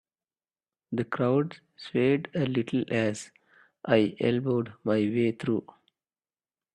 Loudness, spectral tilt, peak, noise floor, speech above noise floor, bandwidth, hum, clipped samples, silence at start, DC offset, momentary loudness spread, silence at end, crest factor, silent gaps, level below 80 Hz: -28 LUFS; -7 dB/octave; -8 dBFS; under -90 dBFS; over 63 dB; 10.5 kHz; none; under 0.1%; 0.9 s; under 0.1%; 10 LU; 1.15 s; 20 dB; none; -68 dBFS